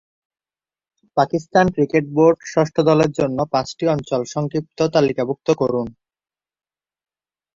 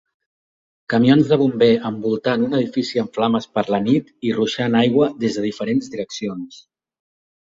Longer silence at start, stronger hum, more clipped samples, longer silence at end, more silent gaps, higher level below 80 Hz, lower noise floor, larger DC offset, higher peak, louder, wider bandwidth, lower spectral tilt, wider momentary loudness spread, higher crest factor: first, 1.15 s vs 0.9 s; neither; neither; first, 1.65 s vs 1.05 s; neither; about the same, -54 dBFS vs -58 dBFS; about the same, under -90 dBFS vs under -90 dBFS; neither; about the same, -2 dBFS vs -2 dBFS; about the same, -19 LUFS vs -19 LUFS; about the same, 7.6 kHz vs 7.8 kHz; about the same, -6.5 dB/octave vs -6.5 dB/octave; second, 7 LU vs 12 LU; about the same, 18 dB vs 16 dB